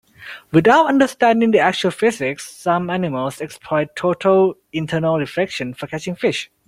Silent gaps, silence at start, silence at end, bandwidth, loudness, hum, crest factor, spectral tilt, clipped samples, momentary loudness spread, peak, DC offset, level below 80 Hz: none; 0.2 s; 0.2 s; 15.5 kHz; -18 LUFS; none; 16 dB; -5.5 dB/octave; under 0.1%; 13 LU; -2 dBFS; under 0.1%; -56 dBFS